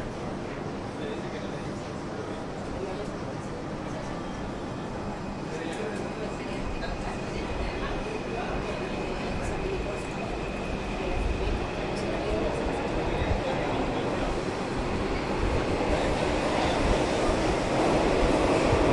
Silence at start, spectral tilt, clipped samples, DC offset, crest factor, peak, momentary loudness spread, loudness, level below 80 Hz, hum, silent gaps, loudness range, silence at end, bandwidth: 0 s; -5.5 dB/octave; under 0.1%; under 0.1%; 18 dB; -12 dBFS; 10 LU; -30 LUFS; -38 dBFS; none; none; 8 LU; 0 s; 11.5 kHz